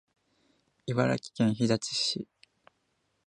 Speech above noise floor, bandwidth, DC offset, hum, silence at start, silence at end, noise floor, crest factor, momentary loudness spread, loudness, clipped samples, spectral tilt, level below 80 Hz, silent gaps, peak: 47 dB; 10.5 kHz; under 0.1%; none; 0.85 s; 1 s; -76 dBFS; 22 dB; 12 LU; -29 LUFS; under 0.1%; -5 dB/octave; -66 dBFS; none; -10 dBFS